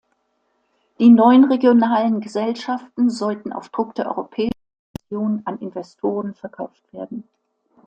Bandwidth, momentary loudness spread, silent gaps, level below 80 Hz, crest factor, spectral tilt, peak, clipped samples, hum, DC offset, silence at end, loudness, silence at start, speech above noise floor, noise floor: 8.6 kHz; 21 LU; 4.79-4.94 s; -60 dBFS; 18 dB; -7 dB/octave; -2 dBFS; under 0.1%; none; under 0.1%; 0.65 s; -18 LUFS; 1 s; 50 dB; -68 dBFS